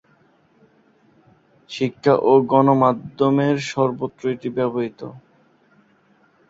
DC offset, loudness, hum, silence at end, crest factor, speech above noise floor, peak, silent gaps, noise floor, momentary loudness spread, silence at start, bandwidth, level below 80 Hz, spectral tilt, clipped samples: under 0.1%; -19 LUFS; none; 1.3 s; 18 dB; 39 dB; -2 dBFS; none; -58 dBFS; 13 LU; 1.7 s; 7.8 kHz; -64 dBFS; -7 dB/octave; under 0.1%